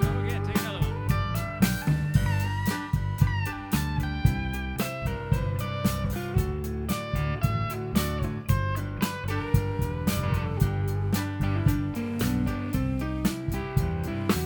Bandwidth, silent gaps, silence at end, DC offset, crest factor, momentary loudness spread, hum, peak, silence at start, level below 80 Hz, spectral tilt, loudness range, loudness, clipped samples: 19.5 kHz; none; 0 s; under 0.1%; 20 dB; 4 LU; none; -8 dBFS; 0 s; -36 dBFS; -6 dB/octave; 2 LU; -28 LUFS; under 0.1%